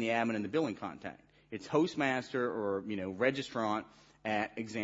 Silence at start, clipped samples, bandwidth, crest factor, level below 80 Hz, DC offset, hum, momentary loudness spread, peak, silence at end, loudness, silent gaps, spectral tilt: 0 s; under 0.1%; 7.6 kHz; 20 dB; -74 dBFS; under 0.1%; none; 11 LU; -14 dBFS; 0 s; -34 LUFS; none; -4 dB/octave